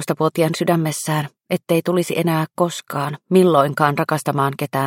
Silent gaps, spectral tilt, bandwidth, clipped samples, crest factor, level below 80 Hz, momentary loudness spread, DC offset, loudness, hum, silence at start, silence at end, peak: none; -6 dB/octave; 17 kHz; under 0.1%; 18 dB; -64 dBFS; 9 LU; under 0.1%; -19 LUFS; none; 0 s; 0 s; 0 dBFS